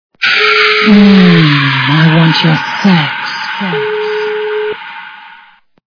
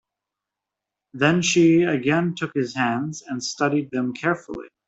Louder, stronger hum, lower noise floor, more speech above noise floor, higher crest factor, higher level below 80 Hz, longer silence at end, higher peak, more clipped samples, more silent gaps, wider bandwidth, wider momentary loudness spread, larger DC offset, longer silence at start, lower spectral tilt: first, -9 LUFS vs -22 LUFS; neither; second, -43 dBFS vs -86 dBFS; second, 32 dB vs 64 dB; second, 10 dB vs 20 dB; first, -48 dBFS vs -62 dBFS; first, 0.65 s vs 0.2 s; first, 0 dBFS vs -4 dBFS; first, 0.9% vs under 0.1%; neither; second, 5.4 kHz vs 8.2 kHz; about the same, 12 LU vs 12 LU; neither; second, 0.2 s vs 1.15 s; first, -6.5 dB/octave vs -5 dB/octave